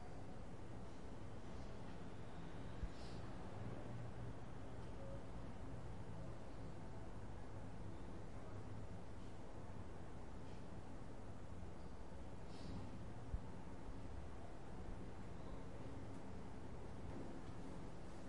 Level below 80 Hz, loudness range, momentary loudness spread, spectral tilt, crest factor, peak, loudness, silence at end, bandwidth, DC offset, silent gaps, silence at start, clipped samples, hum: -58 dBFS; 2 LU; 4 LU; -7 dB/octave; 20 dB; -34 dBFS; -55 LUFS; 0 s; 11 kHz; 0.3%; none; 0 s; under 0.1%; none